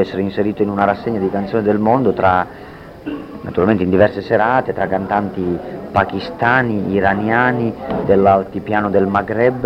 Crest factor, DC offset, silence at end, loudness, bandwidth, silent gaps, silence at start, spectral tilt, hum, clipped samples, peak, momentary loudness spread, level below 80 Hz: 16 dB; under 0.1%; 0 s; -16 LUFS; 6.4 kHz; none; 0 s; -8.5 dB/octave; none; under 0.1%; 0 dBFS; 9 LU; -44 dBFS